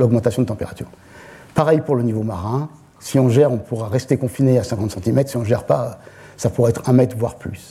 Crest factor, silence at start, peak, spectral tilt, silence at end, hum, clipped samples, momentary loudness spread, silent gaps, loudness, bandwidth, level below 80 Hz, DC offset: 16 dB; 0 s; -2 dBFS; -7.5 dB/octave; 0 s; none; under 0.1%; 13 LU; none; -19 LUFS; 14.5 kHz; -48 dBFS; under 0.1%